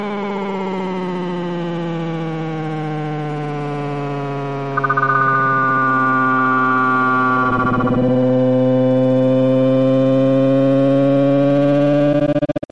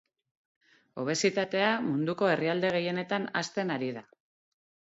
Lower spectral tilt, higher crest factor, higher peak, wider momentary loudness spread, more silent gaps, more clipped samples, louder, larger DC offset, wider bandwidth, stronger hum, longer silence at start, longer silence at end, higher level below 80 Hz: first, -8.5 dB/octave vs -4.5 dB/octave; second, 12 dB vs 20 dB; first, -4 dBFS vs -12 dBFS; about the same, 9 LU vs 9 LU; neither; neither; first, -16 LUFS vs -29 LUFS; neither; about the same, 7.4 kHz vs 8 kHz; neither; second, 0 s vs 0.95 s; second, 0.15 s vs 0.9 s; first, -50 dBFS vs -76 dBFS